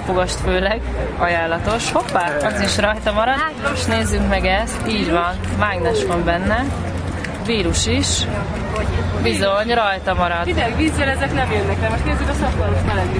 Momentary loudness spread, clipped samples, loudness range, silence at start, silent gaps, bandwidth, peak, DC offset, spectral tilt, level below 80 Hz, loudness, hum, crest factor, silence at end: 4 LU; under 0.1%; 1 LU; 0 s; none; 10.5 kHz; -2 dBFS; under 0.1%; -4.5 dB/octave; -28 dBFS; -19 LUFS; none; 16 dB; 0 s